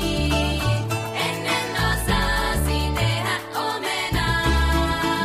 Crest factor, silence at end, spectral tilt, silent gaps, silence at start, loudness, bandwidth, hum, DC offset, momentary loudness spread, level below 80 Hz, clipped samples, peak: 14 dB; 0 s; -4.5 dB/octave; none; 0 s; -22 LUFS; 15.5 kHz; none; under 0.1%; 4 LU; -28 dBFS; under 0.1%; -8 dBFS